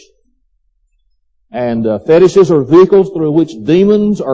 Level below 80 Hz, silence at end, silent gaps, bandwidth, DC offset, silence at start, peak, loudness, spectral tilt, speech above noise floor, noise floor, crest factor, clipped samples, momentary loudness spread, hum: -48 dBFS; 0 s; none; 8 kHz; under 0.1%; 1.55 s; 0 dBFS; -10 LUFS; -7.5 dB/octave; 49 dB; -58 dBFS; 12 dB; under 0.1%; 9 LU; none